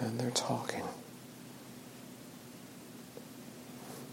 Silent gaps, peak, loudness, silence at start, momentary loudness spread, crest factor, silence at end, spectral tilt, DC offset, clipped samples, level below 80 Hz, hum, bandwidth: none; -16 dBFS; -41 LUFS; 0 s; 17 LU; 26 dB; 0 s; -4 dB/octave; under 0.1%; under 0.1%; -76 dBFS; none; 16.5 kHz